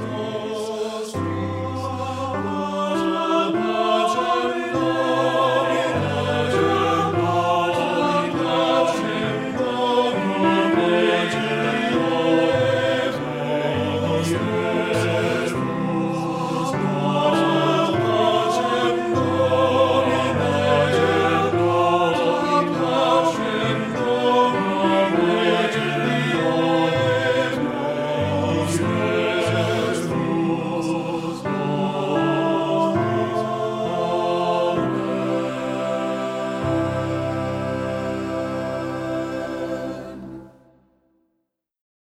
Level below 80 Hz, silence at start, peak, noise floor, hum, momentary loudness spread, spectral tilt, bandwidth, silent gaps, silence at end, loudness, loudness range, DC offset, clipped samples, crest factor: -56 dBFS; 0 s; -6 dBFS; -75 dBFS; none; 8 LU; -6 dB/octave; 14.5 kHz; none; 1.65 s; -21 LUFS; 6 LU; under 0.1%; under 0.1%; 16 dB